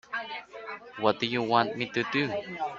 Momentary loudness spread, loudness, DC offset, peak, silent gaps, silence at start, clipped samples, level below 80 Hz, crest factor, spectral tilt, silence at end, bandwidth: 15 LU; -29 LUFS; under 0.1%; -6 dBFS; none; 0.1 s; under 0.1%; -68 dBFS; 24 dB; -5.5 dB/octave; 0 s; 7.8 kHz